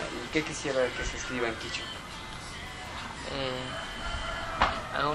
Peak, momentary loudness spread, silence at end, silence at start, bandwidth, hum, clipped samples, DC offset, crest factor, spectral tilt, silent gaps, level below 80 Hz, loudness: -8 dBFS; 11 LU; 0 s; 0 s; 14.5 kHz; none; under 0.1%; under 0.1%; 24 dB; -3.5 dB/octave; none; -44 dBFS; -33 LUFS